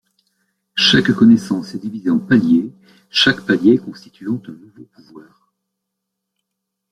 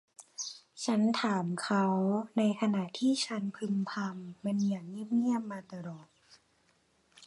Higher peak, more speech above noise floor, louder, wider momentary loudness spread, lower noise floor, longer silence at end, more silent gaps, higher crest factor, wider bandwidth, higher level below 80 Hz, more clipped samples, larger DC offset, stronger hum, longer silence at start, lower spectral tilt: first, -2 dBFS vs -16 dBFS; first, 62 dB vs 39 dB; first, -15 LUFS vs -32 LUFS; about the same, 15 LU vs 13 LU; first, -78 dBFS vs -71 dBFS; first, 1.7 s vs 0 s; neither; about the same, 16 dB vs 16 dB; about the same, 11 kHz vs 11.5 kHz; first, -56 dBFS vs -80 dBFS; neither; neither; neither; first, 0.75 s vs 0.4 s; about the same, -5 dB/octave vs -5.5 dB/octave